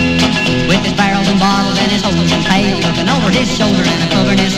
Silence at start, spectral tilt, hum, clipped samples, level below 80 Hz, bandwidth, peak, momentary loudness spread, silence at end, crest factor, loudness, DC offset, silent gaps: 0 s; -4.5 dB/octave; none; under 0.1%; -32 dBFS; 13.5 kHz; 0 dBFS; 1 LU; 0 s; 12 dB; -12 LUFS; under 0.1%; none